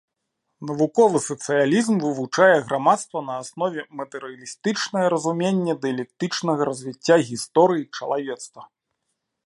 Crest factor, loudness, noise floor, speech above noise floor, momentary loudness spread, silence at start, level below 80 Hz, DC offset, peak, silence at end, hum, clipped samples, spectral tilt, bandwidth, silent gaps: 20 dB; -22 LUFS; -78 dBFS; 56 dB; 14 LU; 0.6 s; -72 dBFS; under 0.1%; -2 dBFS; 0.8 s; none; under 0.1%; -5 dB/octave; 11.5 kHz; none